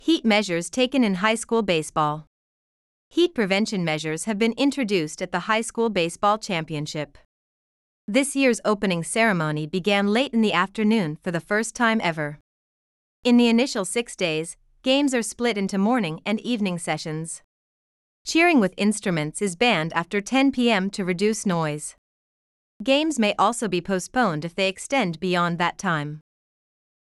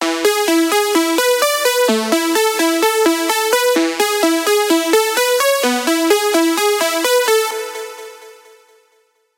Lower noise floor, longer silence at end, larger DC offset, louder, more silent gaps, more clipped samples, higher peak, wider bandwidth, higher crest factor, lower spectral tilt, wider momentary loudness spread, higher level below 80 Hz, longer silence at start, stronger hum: first, under -90 dBFS vs -59 dBFS; second, 0.8 s vs 1.05 s; neither; second, -23 LUFS vs -14 LUFS; first, 2.27-3.11 s, 7.25-8.08 s, 12.41-13.23 s, 17.44-18.25 s, 21.98-22.80 s vs none; neither; second, -6 dBFS vs 0 dBFS; second, 13 kHz vs 17 kHz; about the same, 18 dB vs 16 dB; first, -4.5 dB/octave vs -1 dB/octave; first, 9 LU vs 2 LU; first, -60 dBFS vs -70 dBFS; about the same, 0.05 s vs 0 s; neither